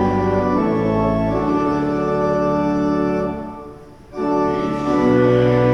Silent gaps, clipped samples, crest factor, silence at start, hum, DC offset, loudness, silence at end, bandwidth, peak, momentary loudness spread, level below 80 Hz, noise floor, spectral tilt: none; under 0.1%; 14 dB; 0 s; none; under 0.1%; -18 LUFS; 0 s; 10 kHz; -4 dBFS; 11 LU; -38 dBFS; -38 dBFS; -8.5 dB/octave